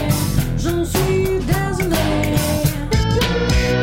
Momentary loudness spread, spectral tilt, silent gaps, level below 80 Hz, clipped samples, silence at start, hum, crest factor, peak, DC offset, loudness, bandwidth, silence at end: 3 LU; -5.5 dB/octave; none; -26 dBFS; under 0.1%; 0 s; none; 12 dB; -4 dBFS; under 0.1%; -18 LUFS; 17 kHz; 0 s